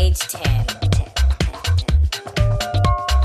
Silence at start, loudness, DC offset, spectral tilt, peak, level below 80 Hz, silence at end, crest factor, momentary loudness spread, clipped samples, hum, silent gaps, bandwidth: 0 s; -20 LUFS; under 0.1%; -4.5 dB/octave; -2 dBFS; -20 dBFS; 0 s; 16 dB; 3 LU; under 0.1%; none; none; 14.5 kHz